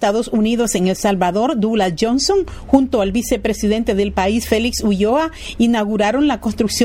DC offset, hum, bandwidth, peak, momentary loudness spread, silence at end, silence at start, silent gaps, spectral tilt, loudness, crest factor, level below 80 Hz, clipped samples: under 0.1%; none; 16.5 kHz; 0 dBFS; 3 LU; 0 s; 0 s; none; -4.5 dB/octave; -17 LUFS; 16 dB; -36 dBFS; under 0.1%